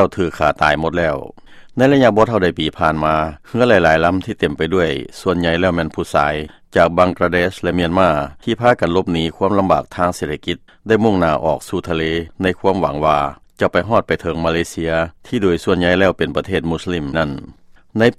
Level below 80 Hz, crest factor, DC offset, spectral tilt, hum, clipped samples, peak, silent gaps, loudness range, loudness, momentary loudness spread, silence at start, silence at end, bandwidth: -38 dBFS; 16 dB; under 0.1%; -6 dB/octave; none; under 0.1%; 0 dBFS; none; 3 LU; -17 LUFS; 8 LU; 0 s; 0.05 s; 14 kHz